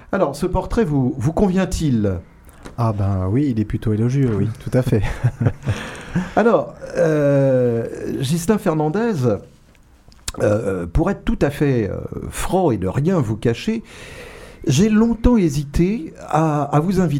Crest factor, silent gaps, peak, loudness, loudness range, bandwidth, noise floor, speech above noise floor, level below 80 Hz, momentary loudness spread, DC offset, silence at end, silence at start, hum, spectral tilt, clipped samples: 18 dB; none; 0 dBFS; -19 LUFS; 3 LU; 16.5 kHz; -49 dBFS; 31 dB; -32 dBFS; 11 LU; under 0.1%; 0 s; 0.1 s; none; -7 dB/octave; under 0.1%